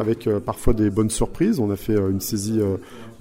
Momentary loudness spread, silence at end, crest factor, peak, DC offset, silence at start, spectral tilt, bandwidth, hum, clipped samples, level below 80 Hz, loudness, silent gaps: 4 LU; 0.1 s; 18 dB; -4 dBFS; under 0.1%; 0 s; -6.5 dB/octave; 16 kHz; none; under 0.1%; -32 dBFS; -22 LUFS; none